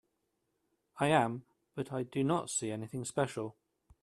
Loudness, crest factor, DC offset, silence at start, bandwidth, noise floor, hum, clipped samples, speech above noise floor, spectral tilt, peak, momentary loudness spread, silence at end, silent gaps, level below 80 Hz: -34 LUFS; 24 dB; under 0.1%; 0.95 s; 13 kHz; -81 dBFS; none; under 0.1%; 48 dB; -5 dB/octave; -12 dBFS; 14 LU; 0.5 s; none; -72 dBFS